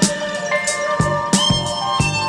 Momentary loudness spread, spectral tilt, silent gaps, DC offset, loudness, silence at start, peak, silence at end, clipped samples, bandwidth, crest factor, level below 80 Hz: 5 LU; -3.5 dB/octave; none; under 0.1%; -18 LUFS; 0 s; -2 dBFS; 0 s; under 0.1%; 16.5 kHz; 18 dB; -38 dBFS